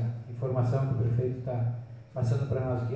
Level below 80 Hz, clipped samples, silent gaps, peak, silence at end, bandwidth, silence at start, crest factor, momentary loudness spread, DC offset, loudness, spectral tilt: -52 dBFS; under 0.1%; none; -16 dBFS; 0 s; 8 kHz; 0 s; 14 dB; 7 LU; under 0.1%; -30 LUFS; -9.5 dB/octave